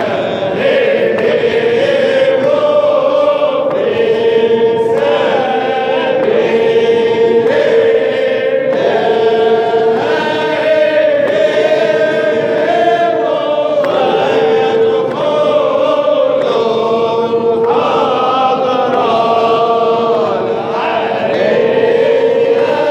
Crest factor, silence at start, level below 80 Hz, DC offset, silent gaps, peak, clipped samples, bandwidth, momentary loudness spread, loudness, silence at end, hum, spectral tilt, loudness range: 10 dB; 0 s; -60 dBFS; under 0.1%; none; 0 dBFS; under 0.1%; 8.4 kHz; 3 LU; -12 LUFS; 0 s; none; -5.5 dB/octave; 1 LU